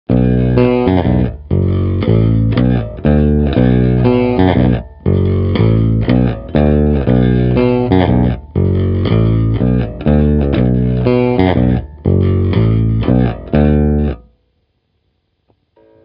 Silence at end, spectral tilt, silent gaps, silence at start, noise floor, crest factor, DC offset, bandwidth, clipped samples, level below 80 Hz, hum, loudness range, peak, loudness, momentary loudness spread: 1.85 s; -12 dB/octave; none; 0.1 s; -63 dBFS; 12 dB; under 0.1%; 5.2 kHz; under 0.1%; -22 dBFS; none; 2 LU; 0 dBFS; -13 LUFS; 4 LU